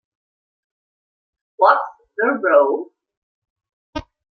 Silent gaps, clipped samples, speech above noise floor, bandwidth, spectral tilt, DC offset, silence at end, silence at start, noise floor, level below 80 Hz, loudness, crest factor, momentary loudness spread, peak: 3.17-3.42 s, 3.50-3.56 s, 3.73-3.93 s; under 0.1%; over 74 dB; 6.2 kHz; -6.5 dB/octave; under 0.1%; 0.3 s; 1.6 s; under -90 dBFS; -54 dBFS; -17 LUFS; 20 dB; 18 LU; -2 dBFS